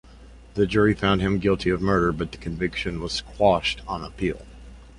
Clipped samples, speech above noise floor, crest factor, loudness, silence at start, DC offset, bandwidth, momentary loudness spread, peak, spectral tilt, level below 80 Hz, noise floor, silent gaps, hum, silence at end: under 0.1%; 23 dB; 18 dB; -24 LUFS; 0.1 s; under 0.1%; 11 kHz; 11 LU; -6 dBFS; -6 dB/octave; -40 dBFS; -46 dBFS; none; none; 0.1 s